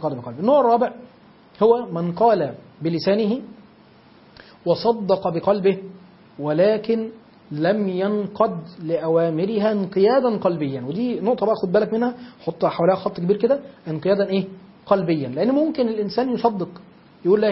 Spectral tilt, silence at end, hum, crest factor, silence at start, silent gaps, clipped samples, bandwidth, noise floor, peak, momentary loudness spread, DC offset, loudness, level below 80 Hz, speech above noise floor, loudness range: -11 dB/octave; 0 s; none; 18 dB; 0 s; none; under 0.1%; 5.8 kHz; -50 dBFS; -2 dBFS; 10 LU; under 0.1%; -21 LUFS; -62 dBFS; 30 dB; 2 LU